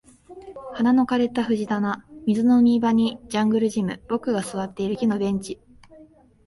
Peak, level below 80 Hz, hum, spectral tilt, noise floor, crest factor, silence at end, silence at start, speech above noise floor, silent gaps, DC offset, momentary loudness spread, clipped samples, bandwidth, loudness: -10 dBFS; -56 dBFS; none; -6.5 dB/octave; -51 dBFS; 14 dB; 0.45 s; 0.3 s; 30 dB; none; under 0.1%; 12 LU; under 0.1%; 11.5 kHz; -22 LUFS